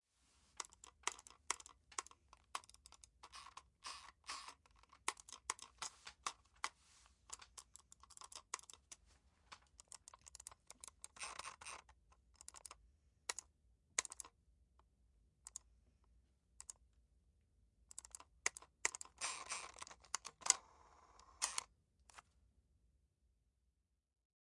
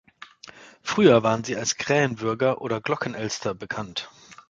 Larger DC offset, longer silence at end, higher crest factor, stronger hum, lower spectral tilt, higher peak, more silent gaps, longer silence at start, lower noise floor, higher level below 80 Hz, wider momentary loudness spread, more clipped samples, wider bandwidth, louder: neither; first, 2.2 s vs 0.15 s; first, 42 dB vs 22 dB; neither; second, 1.5 dB/octave vs -4.5 dB/octave; second, -10 dBFS vs -4 dBFS; neither; first, 0.55 s vs 0.2 s; first, -85 dBFS vs -48 dBFS; second, -76 dBFS vs -60 dBFS; first, 20 LU vs 17 LU; neither; first, 12 kHz vs 9.2 kHz; second, -47 LUFS vs -24 LUFS